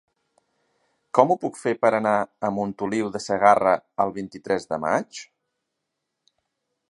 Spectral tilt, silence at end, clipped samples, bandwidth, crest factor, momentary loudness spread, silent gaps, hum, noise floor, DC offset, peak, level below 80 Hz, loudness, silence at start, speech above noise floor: -5.5 dB/octave; 1.65 s; under 0.1%; 11 kHz; 24 dB; 9 LU; none; none; -80 dBFS; under 0.1%; 0 dBFS; -64 dBFS; -23 LUFS; 1.15 s; 58 dB